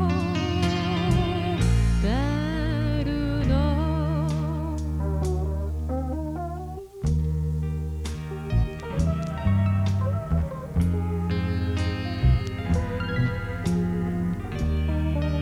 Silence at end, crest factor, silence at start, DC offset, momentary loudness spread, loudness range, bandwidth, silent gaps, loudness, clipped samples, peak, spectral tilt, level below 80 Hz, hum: 0 s; 16 dB; 0 s; under 0.1%; 6 LU; 4 LU; 12.5 kHz; none; -26 LUFS; under 0.1%; -8 dBFS; -7.5 dB/octave; -30 dBFS; none